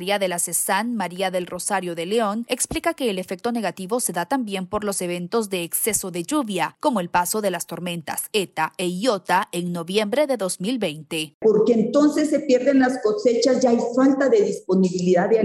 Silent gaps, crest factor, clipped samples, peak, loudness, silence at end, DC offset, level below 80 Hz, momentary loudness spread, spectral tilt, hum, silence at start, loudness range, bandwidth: 11.34-11.40 s; 16 dB; under 0.1%; -6 dBFS; -22 LUFS; 0 s; under 0.1%; -56 dBFS; 8 LU; -4 dB/octave; none; 0 s; 5 LU; 16 kHz